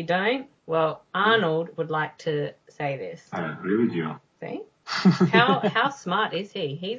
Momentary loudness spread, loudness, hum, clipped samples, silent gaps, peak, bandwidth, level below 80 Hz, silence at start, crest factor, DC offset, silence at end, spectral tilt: 15 LU; -25 LUFS; none; under 0.1%; none; -2 dBFS; 7.6 kHz; -72 dBFS; 0 s; 22 dB; under 0.1%; 0 s; -6.5 dB/octave